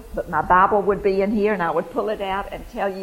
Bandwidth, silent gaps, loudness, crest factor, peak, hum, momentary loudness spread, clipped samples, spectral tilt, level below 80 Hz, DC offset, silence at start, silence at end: 16 kHz; none; -21 LUFS; 16 dB; -4 dBFS; none; 11 LU; under 0.1%; -7 dB/octave; -42 dBFS; under 0.1%; 0 s; 0 s